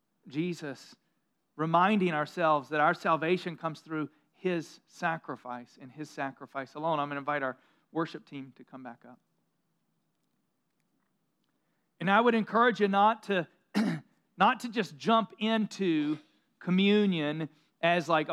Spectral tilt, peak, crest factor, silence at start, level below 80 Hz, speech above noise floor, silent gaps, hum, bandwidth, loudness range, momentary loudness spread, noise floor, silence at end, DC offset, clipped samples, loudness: -6 dB/octave; -10 dBFS; 22 dB; 0.25 s; under -90 dBFS; 49 dB; none; none; 12.5 kHz; 9 LU; 18 LU; -79 dBFS; 0 s; under 0.1%; under 0.1%; -29 LUFS